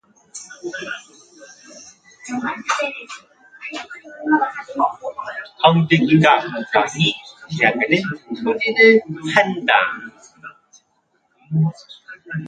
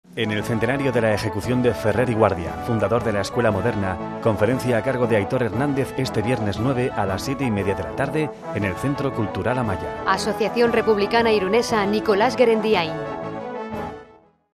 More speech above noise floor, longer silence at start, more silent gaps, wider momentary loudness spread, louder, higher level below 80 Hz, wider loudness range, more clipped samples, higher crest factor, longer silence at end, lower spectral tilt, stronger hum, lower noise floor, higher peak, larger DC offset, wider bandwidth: first, 48 dB vs 30 dB; first, 0.35 s vs 0.1 s; neither; first, 23 LU vs 8 LU; first, -18 LUFS vs -22 LUFS; second, -64 dBFS vs -46 dBFS; first, 11 LU vs 4 LU; neither; about the same, 20 dB vs 18 dB; second, 0 s vs 0.5 s; about the same, -5.5 dB/octave vs -6 dB/octave; neither; first, -65 dBFS vs -51 dBFS; about the same, 0 dBFS vs -2 dBFS; neither; second, 9.2 kHz vs 14 kHz